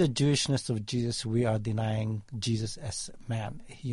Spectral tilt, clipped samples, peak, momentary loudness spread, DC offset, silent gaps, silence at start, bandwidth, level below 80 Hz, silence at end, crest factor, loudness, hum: -5.5 dB/octave; under 0.1%; -14 dBFS; 10 LU; under 0.1%; none; 0 s; 11.5 kHz; -54 dBFS; 0 s; 16 dB; -31 LUFS; none